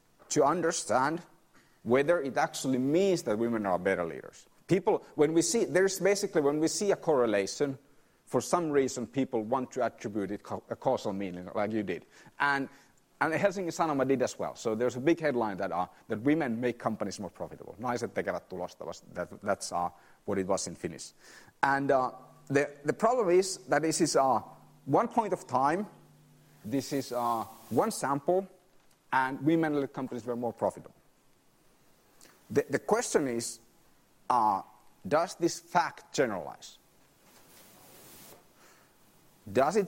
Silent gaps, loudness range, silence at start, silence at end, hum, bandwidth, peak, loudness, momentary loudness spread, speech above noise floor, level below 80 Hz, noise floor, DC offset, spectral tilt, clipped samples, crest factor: none; 7 LU; 0.3 s; 0 s; none; 16 kHz; -8 dBFS; -30 LUFS; 13 LU; 35 dB; -70 dBFS; -65 dBFS; under 0.1%; -4.5 dB/octave; under 0.1%; 24 dB